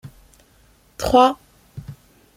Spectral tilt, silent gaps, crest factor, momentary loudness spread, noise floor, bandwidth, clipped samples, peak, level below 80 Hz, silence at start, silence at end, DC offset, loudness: -5 dB/octave; none; 20 dB; 26 LU; -55 dBFS; 16.5 kHz; under 0.1%; -2 dBFS; -44 dBFS; 0.05 s; 0.45 s; under 0.1%; -17 LUFS